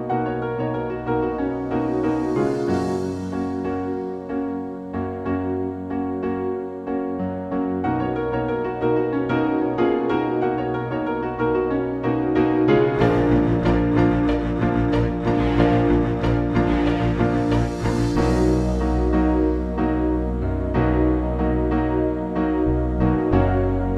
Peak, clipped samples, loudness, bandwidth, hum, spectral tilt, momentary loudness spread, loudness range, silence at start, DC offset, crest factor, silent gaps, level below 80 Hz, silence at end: -4 dBFS; under 0.1%; -22 LUFS; 9.8 kHz; none; -8.5 dB/octave; 8 LU; 6 LU; 0 s; under 0.1%; 16 dB; none; -30 dBFS; 0 s